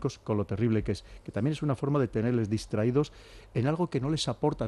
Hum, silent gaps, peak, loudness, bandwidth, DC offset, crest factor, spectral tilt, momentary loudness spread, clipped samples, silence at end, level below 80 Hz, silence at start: none; none; -14 dBFS; -30 LUFS; 12 kHz; under 0.1%; 14 dB; -7 dB/octave; 7 LU; under 0.1%; 0 s; -50 dBFS; 0 s